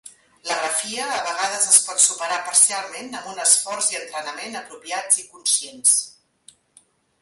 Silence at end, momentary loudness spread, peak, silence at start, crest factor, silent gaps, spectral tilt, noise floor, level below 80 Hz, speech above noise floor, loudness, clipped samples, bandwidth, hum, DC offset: 1.1 s; 17 LU; 0 dBFS; 0.05 s; 22 dB; none; 2 dB/octave; -57 dBFS; -74 dBFS; 36 dB; -18 LUFS; under 0.1%; 12 kHz; none; under 0.1%